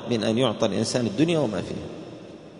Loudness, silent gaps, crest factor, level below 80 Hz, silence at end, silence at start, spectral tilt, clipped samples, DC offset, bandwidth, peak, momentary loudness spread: -24 LUFS; none; 18 dB; -58 dBFS; 0 s; 0 s; -5.5 dB/octave; under 0.1%; under 0.1%; 11 kHz; -6 dBFS; 17 LU